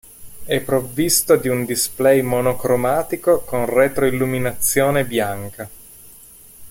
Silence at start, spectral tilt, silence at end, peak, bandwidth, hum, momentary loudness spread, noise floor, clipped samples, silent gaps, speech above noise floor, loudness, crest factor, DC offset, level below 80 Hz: 0.2 s; -4 dB/octave; 0 s; -2 dBFS; 16.5 kHz; none; 9 LU; -44 dBFS; under 0.1%; none; 26 dB; -18 LUFS; 18 dB; under 0.1%; -46 dBFS